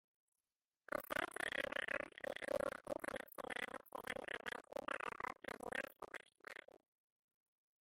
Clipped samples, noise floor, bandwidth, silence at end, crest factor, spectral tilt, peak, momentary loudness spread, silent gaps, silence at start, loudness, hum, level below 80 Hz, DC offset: under 0.1%; under -90 dBFS; 16.5 kHz; 1.3 s; 22 dB; -3 dB/octave; -26 dBFS; 12 LU; none; 0.9 s; -46 LUFS; none; -76 dBFS; under 0.1%